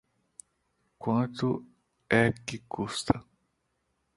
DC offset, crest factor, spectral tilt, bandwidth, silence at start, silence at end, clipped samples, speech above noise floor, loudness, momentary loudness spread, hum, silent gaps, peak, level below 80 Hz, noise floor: under 0.1%; 26 dB; -5.5 dB/octave; 11.5 kHz; 1 s; 0.95 s; under 0.1%; 49 dB; -30 LUFS; 12 LU; none; none; -6 dBFS; -56 dBFS; -77 dBFS